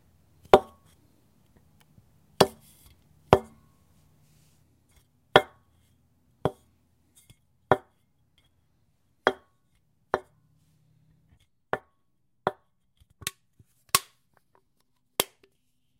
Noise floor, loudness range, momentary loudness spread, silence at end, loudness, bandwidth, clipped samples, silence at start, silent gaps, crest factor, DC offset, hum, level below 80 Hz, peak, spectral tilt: -76 dBFS; 9 LU; 15 LU; 0.75 s; -27 LUFS; 16 kHz; under 0.1%; 0.55 s; none; 32 dB; under 0.1%; none; -56 dBFS; 0 dBFS; -3.5 dB/octave